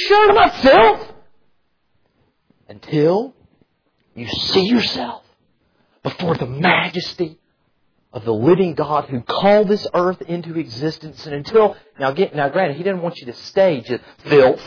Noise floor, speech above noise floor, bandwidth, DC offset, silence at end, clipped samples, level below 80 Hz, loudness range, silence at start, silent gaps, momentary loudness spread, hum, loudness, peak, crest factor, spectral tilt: -67 dBFS; 51 dB; 5.4 kHz; under 0.1%; 0 s; under 0.1%; -48 dBFS; 4 LU; 0 s; none; 17 LU; none; -17 LUFS; -2 dBFS; 16 dB; -6.5 dB/octave